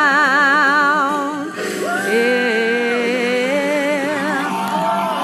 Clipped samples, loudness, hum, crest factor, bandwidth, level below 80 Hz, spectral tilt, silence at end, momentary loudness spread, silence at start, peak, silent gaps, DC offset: under 0.1%; -16 LUFS; none; 14 dB; 15 kHz; -76 dBFS; -4 dB/octave; 0 s; 8 LU; 0 s; -4 dBFS; none; under 0.1%